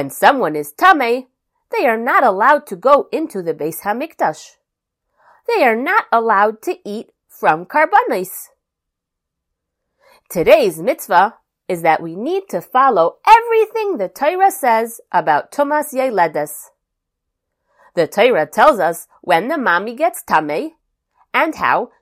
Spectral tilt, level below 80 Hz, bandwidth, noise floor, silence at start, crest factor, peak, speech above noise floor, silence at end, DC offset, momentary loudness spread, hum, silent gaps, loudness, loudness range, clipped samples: -4 dB/octave; -58 dBFS; 16 kHz; -80 dBFS; 0 s; 16 dB; 0 dBFS; 64 dB; 0.15 s; under 0.1%; 12 LU; none; none; -15 LUFS; 5 LU; under 0.1%